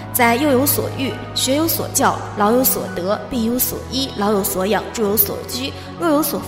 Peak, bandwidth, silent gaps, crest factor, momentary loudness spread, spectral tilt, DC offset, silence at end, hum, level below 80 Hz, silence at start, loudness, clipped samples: -2 dBFS; 16.5 kHz; none; 18 dB; 8 LU; -3.5 dB/octave; under 0.1%; 0 s; none; -44 dBFS; 0 s; -18 LUFS; under 0.1%